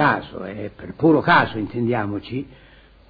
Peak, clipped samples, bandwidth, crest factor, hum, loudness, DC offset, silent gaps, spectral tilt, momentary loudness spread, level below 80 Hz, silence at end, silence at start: -4 dBFS; under 0.1%; 5 kHz; 18 dB; none; -20 LUFS; under 0.1%; none; -9 dB/octave; 17 LU; -50 dBFS; 0.6 s; 0 s